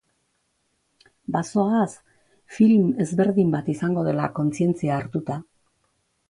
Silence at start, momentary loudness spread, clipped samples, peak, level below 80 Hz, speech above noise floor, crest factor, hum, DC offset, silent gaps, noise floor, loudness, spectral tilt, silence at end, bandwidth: 1.3 s; 11 LU; under 0.1%; -6 dBFS; -62 dBFS; 50 dB; 18 dB; none; under 0.1%; none; -71 dBFS; -22 LUFS; -8 dB/octave; 0.9 s; 11 kHz